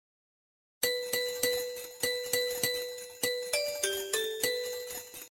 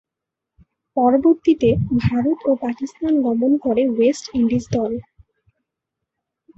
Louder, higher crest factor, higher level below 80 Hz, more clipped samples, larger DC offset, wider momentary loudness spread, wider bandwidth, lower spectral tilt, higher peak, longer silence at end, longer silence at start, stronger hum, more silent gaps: second, -32 LUFS vs -19 LUFS; about the same, 20 dB vs 16 dB; second, -70 dBFS vs -46 dBFS; neither; neither; about the same, 8 LU vs 9 LU; first, 17 kHz vs 8.2 kHz; second, 0 dB/octave vs -7.5 dB/octave; second, -14 dBFS vs -4 dBFS; second, 0.05 s vs 1.55 s; second, 0.8 s vs 0.95 s; neither; neither